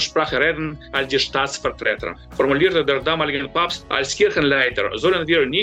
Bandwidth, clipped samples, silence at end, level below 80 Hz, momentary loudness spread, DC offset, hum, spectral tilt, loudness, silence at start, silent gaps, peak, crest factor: 9.2 kHz; under 0.1%; 0 s; -44 dBFS; 6 LU; under 0.1%; none; -3.5 dB/octave; -19 LUFS; 0 s; none; -6 dBFS; 14 dB